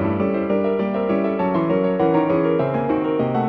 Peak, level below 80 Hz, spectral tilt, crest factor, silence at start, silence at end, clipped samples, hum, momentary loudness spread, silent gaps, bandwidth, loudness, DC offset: -6 dBFS; -52 dBFS; -10.5 dB/octave; 12 dB; 0 s; 0 s; under 0.1%; none; 3 LU; none; 5 kHz; -20 LUFS; under 0.1%